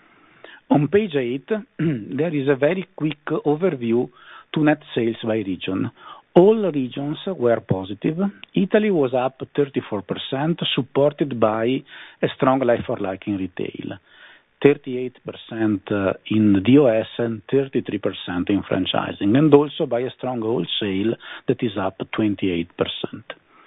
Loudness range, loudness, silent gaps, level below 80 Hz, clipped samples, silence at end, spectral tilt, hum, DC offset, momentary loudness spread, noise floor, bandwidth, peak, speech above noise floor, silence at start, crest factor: 4 LU; -21 LUFS; none; -62 dBFS; under 0.1%; 0.35 s; -9.5 dB/octave; none; under 0.1%; 11 LU; -48 dBFS; 4 kHz; 0 dBFS; 27 dB; 0.45 s; 20 dB